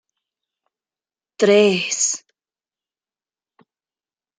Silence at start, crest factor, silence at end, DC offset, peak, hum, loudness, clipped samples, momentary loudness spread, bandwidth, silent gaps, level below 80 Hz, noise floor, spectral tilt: 1.4 s; 22 dB; 2.2 s; under 0.1%; -2 dBFS; none; -17 LUFS; under 0.1%; 7 LU; 9.6 kHz; none; -72 dBFS; under -90 dBFS; -3 dB/octave